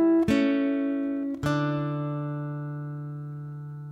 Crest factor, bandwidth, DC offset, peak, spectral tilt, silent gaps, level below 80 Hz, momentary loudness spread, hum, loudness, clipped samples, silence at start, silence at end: 14 dB; 11.5 kHz; under 0.1%; -12 dBFS; -8 dB/octave; none; -56 dBFS; 14 LU; none; -28 LUFS; under 0.1%; 0 s; 0 s